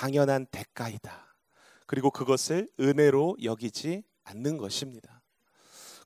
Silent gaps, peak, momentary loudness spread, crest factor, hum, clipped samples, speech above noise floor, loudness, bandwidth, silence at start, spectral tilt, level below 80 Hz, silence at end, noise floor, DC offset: none; -10 dBFS; 20 LU; 20 dB; none; under 0.1%; 38 dB; -28 LUFS; 16 kHz; 0 s; -5.5 dB/octave; -68 dBFS; 0.1 s; -66 dBFS; under 0.1%